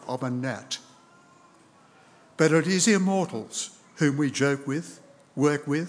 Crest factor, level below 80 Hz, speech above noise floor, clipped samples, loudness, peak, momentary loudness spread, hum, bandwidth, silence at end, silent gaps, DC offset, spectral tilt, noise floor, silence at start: 20 dB; -82 dBFS; 32 dB; under 0.1%; -26 LUFS; -6 dBFS; 14 LU; none; 10.5 kHz; 0 s; none; under 0.1%; -4.5 dB/octave; -56 dBFS; 0.05 s